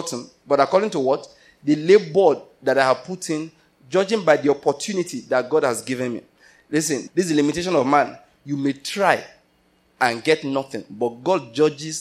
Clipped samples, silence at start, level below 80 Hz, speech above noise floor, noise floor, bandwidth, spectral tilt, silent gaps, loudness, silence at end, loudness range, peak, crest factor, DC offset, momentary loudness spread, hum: under 0.1%; 0 s; -64 dBFS; 41 dB; -61 dBFS; 15 kHz; -4.5 dB/octave; none; -21 LUFS; 0 s; 3 LU; 0 dBFS; 20 dB; under 0.1%; 10 LU; none